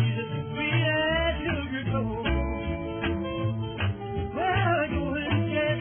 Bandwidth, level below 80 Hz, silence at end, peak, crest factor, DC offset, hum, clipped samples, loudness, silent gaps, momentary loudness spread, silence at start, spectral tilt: 3.5 kHz; -38 dBFS; 0 s; -12 dBFS; 14 dB; under 0.1%; none; under 0.1%; -28 LUFS; none; 7 LU; 0 s; -10 dB/octave